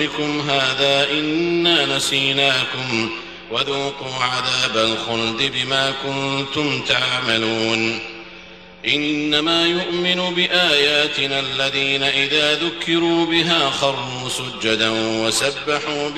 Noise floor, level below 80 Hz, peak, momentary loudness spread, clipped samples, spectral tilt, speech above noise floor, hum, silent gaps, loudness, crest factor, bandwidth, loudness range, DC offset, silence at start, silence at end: -40 dBFS; -54 dBFS; -2 dBFS; 7 LU; under 0.1%; -3 dB/octave; 21 dB; none; none; -18 LUFS; 18 dB; 13 kHz; 3 LU; 0.2%; 0 s; 0 s